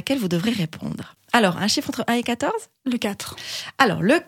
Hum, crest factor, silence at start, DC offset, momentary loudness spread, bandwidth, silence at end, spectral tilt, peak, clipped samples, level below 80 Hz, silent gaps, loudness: none; 22 dB; 0.05 s; under 0.1%; 12 LU; 17 kHz; 0.05 s; -4.5 dB/octave; 0 dBFS; under 0.1%; -60 dBFS; none; -23 LUFS